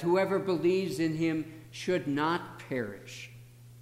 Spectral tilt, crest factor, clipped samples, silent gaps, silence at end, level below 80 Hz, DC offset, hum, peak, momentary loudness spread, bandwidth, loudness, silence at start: -6 dB/octave; 14 dB; under 0.1%; none; 0 s; -68 dBFS; under 0.1%; none; -16 dBFS; 16 LU; 15.5 kHz; -31 LUFS; 0 s